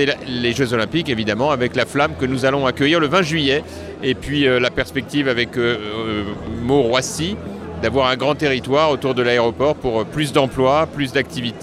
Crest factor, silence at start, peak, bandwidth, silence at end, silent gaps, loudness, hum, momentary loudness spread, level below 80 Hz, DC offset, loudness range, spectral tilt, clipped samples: 18 dB; 0 s; 0 dBFS; 14.5 kHz; 0 s; none; -18 LUFS; none; 7 LU; -42 dBFS; under 0.1%; 2 LU; -5 dB/octave; under 0.1%